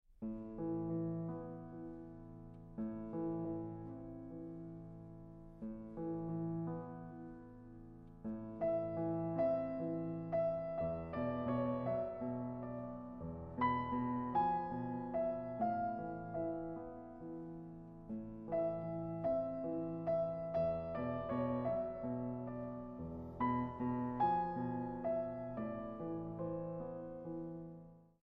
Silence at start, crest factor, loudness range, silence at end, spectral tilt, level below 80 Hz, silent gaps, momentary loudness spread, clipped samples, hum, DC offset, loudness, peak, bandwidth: 0.1 s; 18 dB; 7 LU; 0.2 s; -8.5 dB/octave; -62 dBFS; none; 14 LU; under 0.1%; none; under 0.1%; -41 LUFS; -24 dBFS; 5.4 kHz